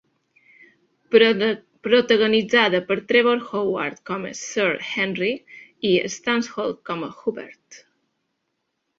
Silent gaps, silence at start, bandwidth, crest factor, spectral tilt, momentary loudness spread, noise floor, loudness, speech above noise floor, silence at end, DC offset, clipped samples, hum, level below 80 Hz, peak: none; 1.1 s; 7.8 kHz; 20 dB; -4 dB/octave; 13 LU; -76 dBFS; -21 LUFS; 55 dB; 1.2 s; under 0.1%; under 0.1%; none; -66 dBFS; -2 dBFS